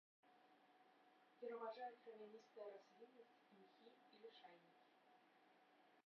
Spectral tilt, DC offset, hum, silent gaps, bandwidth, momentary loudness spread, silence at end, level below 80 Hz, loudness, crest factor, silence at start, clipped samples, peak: -2 dB/octave; under 0.1%; none; none; 6 kHz; 15 LU; 0.05 s; under -90 dBFS; -59 LUFS; 20 dB; 0.25 s; under 0.1%; -40 dBFS